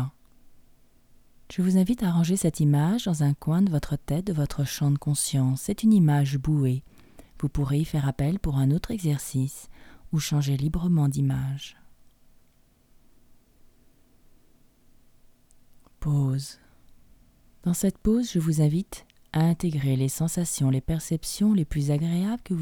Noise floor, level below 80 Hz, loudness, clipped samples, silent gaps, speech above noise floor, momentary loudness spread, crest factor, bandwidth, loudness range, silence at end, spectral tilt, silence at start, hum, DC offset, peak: -60 dBFS; -44 dBFS; -25 LUFS; under 0.1%; none; 36 dB; 9 LU; 14 dB; 18.5 kHz; 9 LU; 0 s; -6.5 dB/octave; 0 s; none; under 0.1%; -12 dBFS